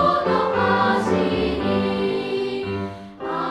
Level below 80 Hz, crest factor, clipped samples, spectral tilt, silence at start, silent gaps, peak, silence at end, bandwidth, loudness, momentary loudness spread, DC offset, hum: -44 dBFS; 16 dB; under 0.1%; -6.5 dB/octave; 0 s; none; -6 dBFS; 0 s; 11.5 kHz; -21 LUFS; 10 LU; under 0.1%; none